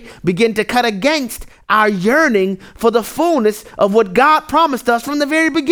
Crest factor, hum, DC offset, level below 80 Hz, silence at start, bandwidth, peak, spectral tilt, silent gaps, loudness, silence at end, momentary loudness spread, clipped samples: 14 dB; none; under 0.1%; -46 dBFS; 0 s; over 20 kHz; 0 dBFS; -4.5 dB/octave; none; -14 LUFS; 0 s; 6 LU; under 0.1%